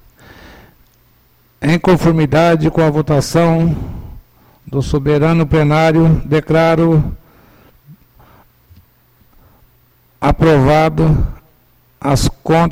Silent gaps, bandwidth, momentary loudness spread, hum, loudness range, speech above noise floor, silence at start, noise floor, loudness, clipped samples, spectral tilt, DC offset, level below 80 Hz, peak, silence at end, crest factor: none; 15.5 kHz; 10 LU; none; 5 LU; 41 dB; 1.6 s; -52 dBFS; -13 LUFS; under 0.1%; -7 dB/octave; under 0.1%; -28 dBFS; -2 dBFS; 0 s; 12 dB